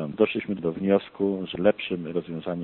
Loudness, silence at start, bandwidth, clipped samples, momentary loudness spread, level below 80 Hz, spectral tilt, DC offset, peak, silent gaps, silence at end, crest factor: -26 LUFS; 0 s; 4.3 kHz; under 0.1%; 7 LU; -60 dBFS; -5.5 dB/octave; under 0.1%; -6 dBFS; none; 0 s; 18 dB